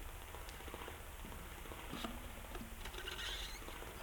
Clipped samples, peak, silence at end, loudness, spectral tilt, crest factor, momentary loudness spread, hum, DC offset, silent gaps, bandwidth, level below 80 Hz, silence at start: under 0.1%; -30 dBFS; 0 s; -48 LUFS; -3 dB/octave; 18 dB; 7 LU; none; under 0.1%; none; 19 kHz; -52 dBFS; 0 s